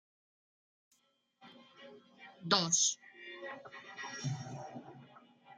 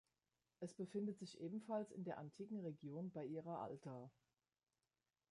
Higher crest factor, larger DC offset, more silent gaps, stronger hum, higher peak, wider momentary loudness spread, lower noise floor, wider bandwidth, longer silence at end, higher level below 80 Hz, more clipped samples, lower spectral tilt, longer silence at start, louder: first, 28 dB vs 18 dB; neither; neither; neither; first, -12 dBFS vs -34 dBFS; first, 27 LU vs 9 LU; second, -75 dBFS vs under -90 dBFS; about the same, 10.5 kHz vs 11 kHz; second, 0 s vs 1.2 s; first, -84 dBFS vs under -90 dBFS; neither; second, -2 dB/octave vs -7.5 dB/octave; first, 1.4 s vs 0.6 s; first, -34 LUFS vs -51 LUFS